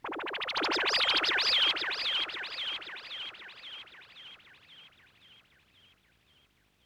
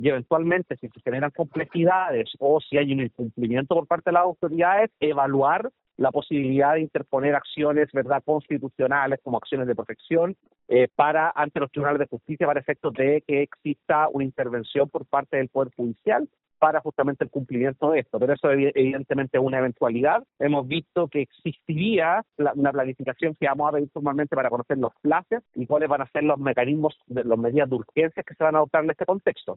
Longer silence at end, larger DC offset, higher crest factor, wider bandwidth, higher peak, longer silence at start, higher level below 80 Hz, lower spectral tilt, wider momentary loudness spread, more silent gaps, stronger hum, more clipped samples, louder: first, 2 s vs 0 s; neither; about the same, 18 dB vs 18 dB; first, over 20 kHz vs 4.1 kHz; second, -16 dBFS vs -6 dBFS; about the same, 0.05 s vs 0 s; second, -72 dBFS vs -66 dBFS; second, -0.5 dB/octave vs -5 dB/octave; first, 23 LU vs 7 LU; neither; neither; neither; second, -29 LUFS vs -24 LUFS